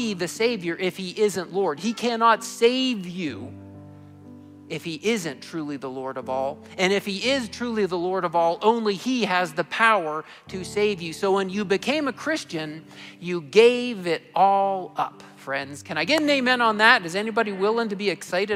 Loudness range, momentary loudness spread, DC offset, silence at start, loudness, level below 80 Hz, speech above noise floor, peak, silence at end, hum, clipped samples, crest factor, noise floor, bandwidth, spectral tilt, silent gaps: 6 LU; 13 LU; under 0.1%; 0 s; -23 LUFS; -66 dBFS; 21 dB; -4 dBFS; 0 s; none; under 0.1%; 20 dB; -45 dBFS; 16 kHz; -4 dB/octave; none